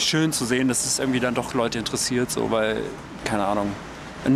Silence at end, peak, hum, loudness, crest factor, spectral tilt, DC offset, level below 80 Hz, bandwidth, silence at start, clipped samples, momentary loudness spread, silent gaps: 0 s; -8 dBFS; none; -24 LUFS; 16 dB; -3.5 dB/octave; under 0.1%; -48 dBFS; 15.5 kHz; 0 s; under 0.1%; 9 LU; none